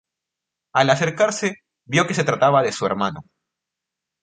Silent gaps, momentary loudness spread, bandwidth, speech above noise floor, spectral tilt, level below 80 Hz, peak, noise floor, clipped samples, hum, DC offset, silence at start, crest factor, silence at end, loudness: none; 9 LU; 9.4 kHz; 65 dB; -4.5 dB/octave; -60 dBFS; 0 dBFS; -84 dBFS; under 0.1%; none; under 0.1%; 0.75 s; 20 dB; 1 s; -20 LUFS